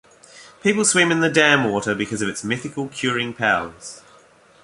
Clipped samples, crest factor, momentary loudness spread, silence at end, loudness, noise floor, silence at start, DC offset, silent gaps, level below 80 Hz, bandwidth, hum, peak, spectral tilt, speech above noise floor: under 0.1%; 20 dB; 12 LU; 0.65 s; -19 LUFS; -51 dBFS; 0.35 s; under 0.1%; none; -58 dBFS; 11.5 kHz; none; -2 dBFS; -3 dB/octave; 31 dB